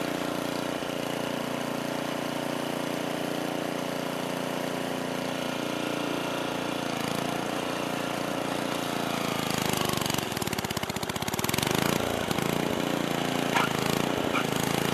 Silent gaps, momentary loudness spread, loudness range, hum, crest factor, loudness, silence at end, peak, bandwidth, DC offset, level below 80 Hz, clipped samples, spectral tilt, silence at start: none; 5 LU; 4 LU; none; 20 dB; -29 LUFS; 0 s; -10 dBFS; 14 kHz; under 0.1%; -56 dBFS; under 0.1%; -4 dB/octave; 0 s